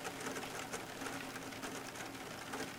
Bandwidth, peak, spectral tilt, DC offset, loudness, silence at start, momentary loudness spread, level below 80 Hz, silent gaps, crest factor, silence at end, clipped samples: 18 kHz; -28 dBFS; -3 dB/octave; under 0.1%; -44 LUFS; 0 s; 3 LU; -70 dBFS; none; 18 dB; 0 s; under 0.1%